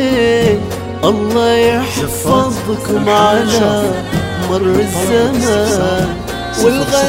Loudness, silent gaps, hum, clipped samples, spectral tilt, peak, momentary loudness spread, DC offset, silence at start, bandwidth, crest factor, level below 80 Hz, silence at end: -13 LUFS; none; none; under 0.1%; -5 dB/octave; 0 dBFS; 7 LU; under 0.1%; 0 s; 16.5 kHz; 12 dB; -34 dBFS; 0 s